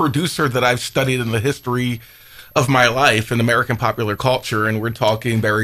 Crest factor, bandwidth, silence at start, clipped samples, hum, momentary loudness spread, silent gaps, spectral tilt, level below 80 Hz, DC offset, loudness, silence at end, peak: 18 dB; 16 kHz; 0 s; under 0.1%; none; 7 LU; none; -5 dB/octave; -48 dBFS; under 0.1%; -18 LUFS; 0 s; 0 dBFS